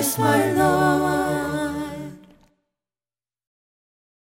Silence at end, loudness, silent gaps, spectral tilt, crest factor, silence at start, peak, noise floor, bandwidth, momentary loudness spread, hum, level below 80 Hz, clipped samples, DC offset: 2.25 s; -21 LUFS; none; -5 dB/octave; 18 dB; 0 s; -4 dBFS; under -90 dBFS; 17 kHz; 14 LU; none; -50 dBFS; under 0.1%; under 0.1%